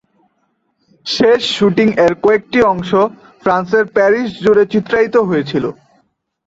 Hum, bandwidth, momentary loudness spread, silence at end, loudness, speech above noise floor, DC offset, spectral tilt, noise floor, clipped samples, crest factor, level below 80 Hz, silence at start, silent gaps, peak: none; 8 kHz; 8 LU; 0.75 s; -13 LUFS; 51 dB; under 0.1%; -5.5 dB/octave; -64 dBFS; under 0.1%; 14 dB; -50 dBFS; 1.05 s; none; 0 dBFS